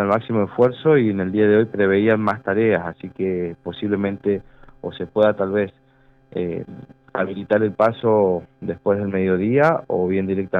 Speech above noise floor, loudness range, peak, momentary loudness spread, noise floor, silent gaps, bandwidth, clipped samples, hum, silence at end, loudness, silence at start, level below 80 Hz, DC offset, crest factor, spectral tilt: 35 dB; 5 LU; -4 dBFS; 12 LU; -54 dBFS; none; 5.6 kHz; under 0.1%; none; 0 s; -20 LUFS; 0 s; -58 dBFS; under 0.1%; 14 dB; -9.5 dB/octave